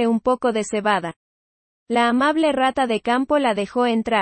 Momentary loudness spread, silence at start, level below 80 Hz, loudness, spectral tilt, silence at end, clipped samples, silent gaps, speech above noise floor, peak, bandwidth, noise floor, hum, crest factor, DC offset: 4 LU; 0 s; -56 dBFS; -20 LUFS; -4.5 dB/octave; 0 s; under 0.1%; 1.16-1.86 s; over 71 dB; -6 dBFS; 8.8 kHz; under -90 dBFS; none; 14 dB; under 0.1%